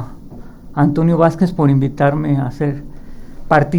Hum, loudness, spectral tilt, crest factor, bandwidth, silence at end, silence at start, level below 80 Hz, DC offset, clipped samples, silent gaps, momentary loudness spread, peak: none; -15 LUFS; -9 dB/octave; 16 dB; 10 kHz; 0 s; 0 s; -36 dBFS; under 0.1%; under 0.1%; none; 10 LU; 0 dBFS